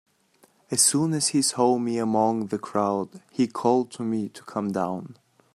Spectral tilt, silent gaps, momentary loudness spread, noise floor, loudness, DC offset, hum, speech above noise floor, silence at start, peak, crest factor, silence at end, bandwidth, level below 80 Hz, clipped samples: -4 dB/octave; none; 11 LU; -62 dBFS; -24 LUFS; under 0.1%; none; 37 dB; 0.7 s; -6 dBFS; 18 dB; 0.4 s; 15 kHz; -70 dBFS; under 0.1%